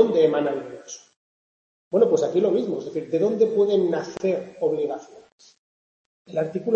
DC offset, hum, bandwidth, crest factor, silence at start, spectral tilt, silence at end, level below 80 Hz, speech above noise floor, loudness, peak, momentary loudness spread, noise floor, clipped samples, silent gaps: under 0.1%; none; 7.8 kHz; 20 dB; 0 s; -6.5 dB/octave; 0 s; -72 dBFS; over 68 dB; -23 LUFS; -4 dBFS; 14 LU; under -90 dBFS; under 0.1%; 1.16-1.91 s, 5.32-5.39 s, 5.58-6.25 s